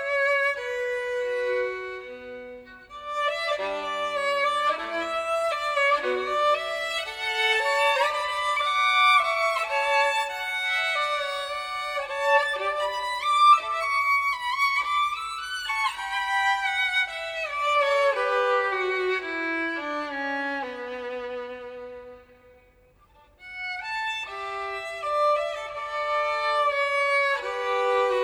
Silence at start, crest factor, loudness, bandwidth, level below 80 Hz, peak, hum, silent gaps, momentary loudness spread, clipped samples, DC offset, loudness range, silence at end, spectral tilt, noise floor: 0 s; 20 dB; -25 LUFS; 16.5 kHz; -62 dBFS; -6 dBFS; none; none; 12 LU; under 0.1%; under 0.1%; 10 LU; 0 s; -1 dB/octave; -58 dBFS